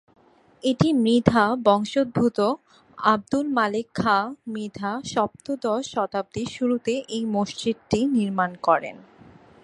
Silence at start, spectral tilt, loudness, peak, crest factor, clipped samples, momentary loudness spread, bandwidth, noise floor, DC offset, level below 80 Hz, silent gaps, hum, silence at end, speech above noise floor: 0.65 s; -6 dB/octave; -23 LUFS; 0 dBFS; 24 dB; under 0.1%; 10 LU; 11.5 kHz; -50 dBFS; under 0.1%; -54 dBFS; none; none; 0.65 s; 27 dB